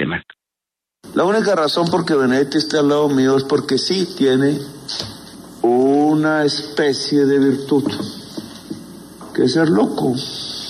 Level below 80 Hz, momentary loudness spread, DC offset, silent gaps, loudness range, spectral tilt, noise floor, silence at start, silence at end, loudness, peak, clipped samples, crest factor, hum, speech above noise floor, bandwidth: -56 dBFS; 17 LU; under 0.1%; none; 3 LU; -5.5 dB/octave; -85 dBFS; 0 s; 0 s; -17 LUFS; -4 dBFS; under 0.1%; 12 dB; none; 69 dB; 13.5 kHz